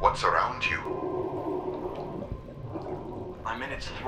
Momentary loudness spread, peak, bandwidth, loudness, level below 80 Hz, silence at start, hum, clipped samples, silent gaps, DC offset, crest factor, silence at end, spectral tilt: 13 LU; -6 dBFS; 12 kHz; -31 LUFS; -46 dBFS; 0 s; none; under 0.1%; none; under 0.1%; 24 dB; 0 s; -5 dB/octave